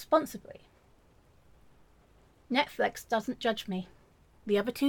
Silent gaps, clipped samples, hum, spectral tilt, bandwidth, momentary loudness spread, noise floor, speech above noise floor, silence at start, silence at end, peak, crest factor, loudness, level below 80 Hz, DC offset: none; under 0.1%; none; -4.5 dB/octave; 17.5 kHz; 19 LU; -62 dBFS; 32 dB; 0 s; 0 s; -12 dBFS; 22 dB; -32 LUFS; -64 dBFS; under 0.1%